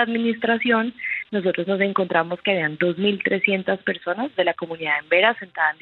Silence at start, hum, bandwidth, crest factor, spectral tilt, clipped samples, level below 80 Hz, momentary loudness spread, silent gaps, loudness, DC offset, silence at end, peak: 0 s; none; 4.4 kHz; 18 dB; -8.5 dB/octave; under 0.1%; -70 dBFS; 6 LU; none; -21 LUFS; under 0.1%; 0.1 s; -4 dBFS